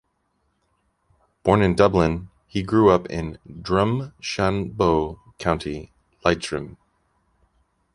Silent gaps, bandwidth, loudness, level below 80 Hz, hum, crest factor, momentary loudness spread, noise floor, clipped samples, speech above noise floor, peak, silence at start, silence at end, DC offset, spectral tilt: none; 11.5 kHz; -22 LUFS; -42 dBFS; none; 22 dB; 15 LU; -70 dBFS; under 0.1%; 49 dB; -2 dBFS; 1.45 s; 1.2 s; under 0.1%; -6.5 dB/octave